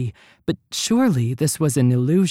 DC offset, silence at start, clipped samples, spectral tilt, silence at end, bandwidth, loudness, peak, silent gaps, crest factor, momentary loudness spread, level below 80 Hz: under 0.1%; 0 s; under 0.1%; -5.5 dB/octave; 0 s; 16.5 kHz; -20 LUFS; -8 dBFS; none; 12 dB; 10 LU; -56 dBFS